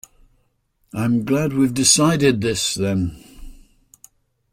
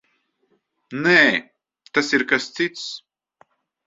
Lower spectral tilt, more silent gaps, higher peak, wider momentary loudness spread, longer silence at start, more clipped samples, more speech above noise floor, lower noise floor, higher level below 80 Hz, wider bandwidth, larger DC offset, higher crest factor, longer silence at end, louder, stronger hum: about the same, -4 dB/octave vs -3.5 dB/octave; neither; about the same, 0 dBFS vs 0 dBFS; second, 11 LU vs 18 LU; about the same, 0.95 s vs 0.9 s; neither; about the same, 47 dB vs 48 dB; about the same, -65 dBFS vs -68 dBFS; first, -46 dBFS vs -66 dBFS; first, 16 kHz vs 8 kHz; neither; about the same, 20 dB vs 22 dB; about the same, 1 s vs 0.9 s; about the same, -18 LUFS vs -19 LUFS; neither